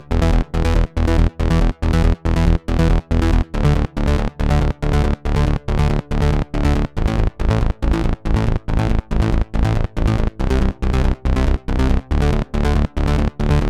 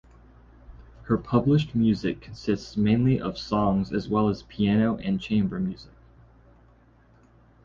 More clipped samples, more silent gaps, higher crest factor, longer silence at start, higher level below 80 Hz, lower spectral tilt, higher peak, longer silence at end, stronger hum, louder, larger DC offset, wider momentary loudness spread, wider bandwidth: neither; neither; second, 12 dB vs 18 dB; second, 0 s vs 0.7 s; first, -18 dBFS vs -48 dBFS; about the same, -7.5 dB/octave vs -8 dB/octave; first, -4 dBFS vs -8 dBFS; second, 0 s vs 1.8 s; neither; first, -19 LUFS vs -25 LUFS; neither; second, 2 LU vs 7 LU; first, 11 kHz vs 7.2 kHz